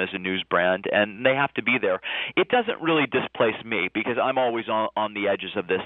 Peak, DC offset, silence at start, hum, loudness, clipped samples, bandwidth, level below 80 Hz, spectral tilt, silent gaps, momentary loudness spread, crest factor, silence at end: -6 dBFS; under 0.1%; 0 s; none; -24 LUFS; under 0.1%; 4.1 kHz; -66 dBFS; -8.5 dB/octave; none; 4 LU; 18 dB; 0 s